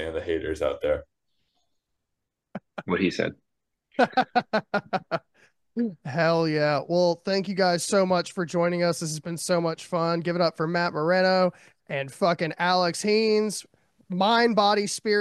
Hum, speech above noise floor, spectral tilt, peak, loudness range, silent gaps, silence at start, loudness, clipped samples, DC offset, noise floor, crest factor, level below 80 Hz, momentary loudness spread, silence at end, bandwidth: none; 58 dB; -4.5 dB/octave; -8 dBFS; 6 LU; none; 0 s; -25 LUFS; under 0.1%; under 0.1%; -83 dBFS; 18 dB; -56 dBFS; 10 LU; 0 s; 12.5 kHz